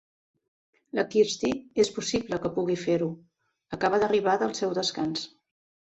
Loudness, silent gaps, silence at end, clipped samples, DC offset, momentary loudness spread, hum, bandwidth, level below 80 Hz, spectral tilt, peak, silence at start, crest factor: -27 LUFS; none; 0.65 s; under 0.1%; under 0.1%; 10 LU; none; 8.2 kHz; -62 dBFS; -4.5 dB/octave; -10 dBFS; 0.95 s; 18 dB